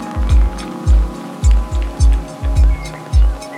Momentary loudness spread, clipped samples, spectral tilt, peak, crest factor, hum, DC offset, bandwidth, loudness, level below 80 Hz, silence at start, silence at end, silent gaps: 6 LU; under 0.1%; -6.5 dB/octave; -2 dBFS; 12 dB; none; under 0.1%; 10 kHz; -17 LUFS; -14 dBFS; 0 s; 0 s; none